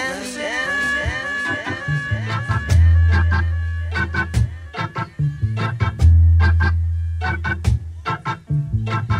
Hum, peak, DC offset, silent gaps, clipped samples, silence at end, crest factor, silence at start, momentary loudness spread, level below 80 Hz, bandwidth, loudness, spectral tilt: none; -4 dBFS; under 0.1%; none; under 0.1%; 0 s; 14 dB; 0 s; 10 LU; -28 dBFS; 10.5 kHz; -20 LUFS; -6 dB/octave